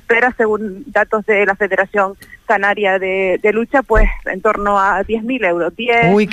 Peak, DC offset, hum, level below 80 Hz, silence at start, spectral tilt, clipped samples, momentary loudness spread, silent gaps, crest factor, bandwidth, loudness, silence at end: -2 dBFS; under 0.1%; none; -26 dBFS; 0.1 s; -6.5 dB/octave; under 0.1%; 5 LU; none; 12 dB; 13 kHz; -15 LUFS; 0 s